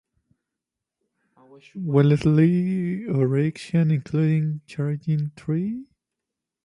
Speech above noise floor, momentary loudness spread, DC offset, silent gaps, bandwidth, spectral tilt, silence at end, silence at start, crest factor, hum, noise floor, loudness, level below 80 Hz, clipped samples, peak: 64 dB; 10 LU; under 0.1%; none; 10.5 kHz; -9 dB/octave; 0.8 s; 1.75 s; 18 dB; none; -86 dBFS; -23 LUFS; -56 dBFS; under 0.1%; -6 dBFS